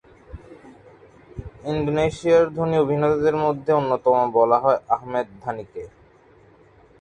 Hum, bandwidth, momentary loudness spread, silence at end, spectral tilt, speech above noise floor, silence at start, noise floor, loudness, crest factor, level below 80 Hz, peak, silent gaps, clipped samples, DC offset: none; 9.4 kHz; 20 LU; 1.15 s; -7.5 dB/octave; 32 dB; 0.35 s; -53 dBFS; -21 LUFS; 18 dB; -50 dBFS; -4 dBFS; none; under 0.1%; under 0.1%